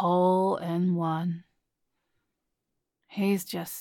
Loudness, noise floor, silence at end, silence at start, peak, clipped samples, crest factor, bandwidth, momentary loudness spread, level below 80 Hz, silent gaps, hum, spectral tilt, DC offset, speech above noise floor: -27 LUFS; -83 dBFS; 0 s; 0 s; -14 dBFS; under 0.1%; 14 dB; 17.5 kHz; 11 LU; -78 dBFS; none; none; -7 dB/octave; under 0.1%; 56 dB